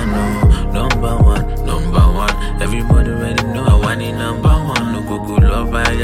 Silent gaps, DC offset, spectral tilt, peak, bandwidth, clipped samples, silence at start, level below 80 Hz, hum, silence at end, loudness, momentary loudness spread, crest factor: none; under 0.1%; -6.5 dB/octave; 0 dBFS; 15 kHz; under 0.1%; 0 s; -16 dBFS; none; 0 s; -15 LUFS; 6 LU; 12 dB